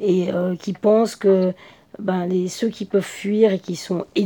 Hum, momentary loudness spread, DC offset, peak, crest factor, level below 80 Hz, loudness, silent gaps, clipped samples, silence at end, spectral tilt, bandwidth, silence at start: none; 9 LU; under 0.1%; -4 dBFS; 16 dB; -66 dBFS; -21 LUFS; none; under 0.1%; 0 s; -6.5 dB/octave; 18.5 kHz; 0 s